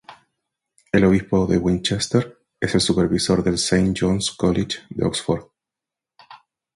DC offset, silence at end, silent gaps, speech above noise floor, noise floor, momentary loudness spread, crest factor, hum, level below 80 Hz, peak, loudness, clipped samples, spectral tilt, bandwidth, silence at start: under 0.1%; 0.4 s; none; 68 dB; -87 dBFS; 7 LU; 18 dB; none; -42 dBFS; -2 dBFS; -20 LUFS; under 0.1%; -5 dB/octave; 11.5 kHz; 0.1 s